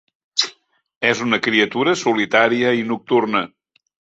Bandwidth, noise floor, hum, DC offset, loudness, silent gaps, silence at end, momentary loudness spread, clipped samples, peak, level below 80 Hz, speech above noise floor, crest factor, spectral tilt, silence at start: 8 kHz; -49 dBFS; none; under 0.1%; -18 LUFS; 0.96-1.01 s; 0.7 s; 7 LU; under 0.1%; -2 dBFS; -62 dBFS; 31 dB; 18 dB; -3.5 dB/octave; 0.35 s